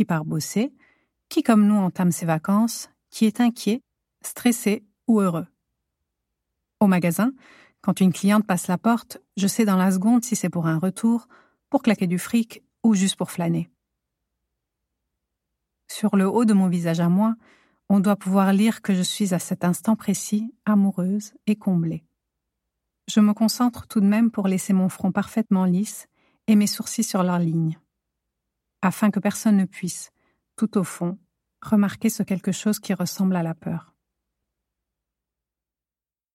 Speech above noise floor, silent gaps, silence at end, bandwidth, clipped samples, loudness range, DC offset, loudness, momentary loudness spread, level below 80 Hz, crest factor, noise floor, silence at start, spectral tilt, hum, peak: over 69 dB; none; 2.55 s; 16 kHz; under 0.1%; 4 LU; under 0.1%; -22 LUFS; 10 LU; -68 dBFS; 18 dB; under -90 dBFS; 0 s; -6 dB/octave; none; -6 dBFS